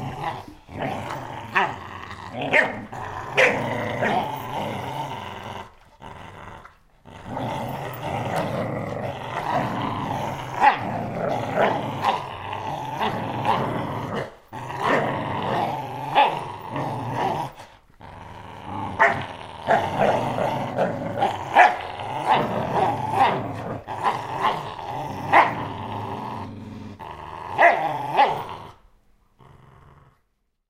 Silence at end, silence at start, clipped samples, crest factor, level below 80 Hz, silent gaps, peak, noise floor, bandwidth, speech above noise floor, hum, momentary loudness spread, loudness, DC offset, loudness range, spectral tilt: 0.8 s; 0 s; under 0.1%; 24 dB; -54 dBFS; none; 0 dBFS; -70 dBFS; 16 kHz; 49 dB; none; 17 LU; -24 LUFS; under 0.1%; 8 LU; -5.5 dB/octave